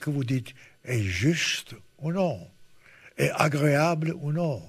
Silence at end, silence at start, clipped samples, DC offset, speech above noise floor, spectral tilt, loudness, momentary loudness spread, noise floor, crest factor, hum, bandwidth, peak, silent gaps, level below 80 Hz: 0 s; 0 s; under 0.1%; under 0.1%; 27 dB; -5.5 dB/octave; -26 LUFS; 18 LU; -53 dBFS; 22 dB; none; 14 kHz; -4 dBFS; none; -58 dBFS